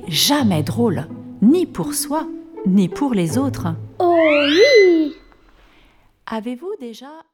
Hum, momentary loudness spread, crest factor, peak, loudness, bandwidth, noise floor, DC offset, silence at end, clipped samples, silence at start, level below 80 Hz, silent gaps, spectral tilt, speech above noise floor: none; 17 LU; 16 dB; -2 dBFS; -17 LUFS; 19.5 kHz; -53 dBFS; under 0.1%; 0.15 s; under 0.1%; 0 s; -50 dBFS; none; -4.5 dB/octave; 36 dB